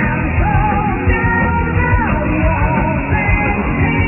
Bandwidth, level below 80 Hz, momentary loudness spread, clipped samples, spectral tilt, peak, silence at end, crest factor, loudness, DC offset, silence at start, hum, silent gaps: 3 kHz; -20 dBFS; 2 LU; under 0.1%; -11 dB/octave; -2 dBFS; 0 s; 12 dB; -15 LUFS; under 0.1%; 0 s; none; none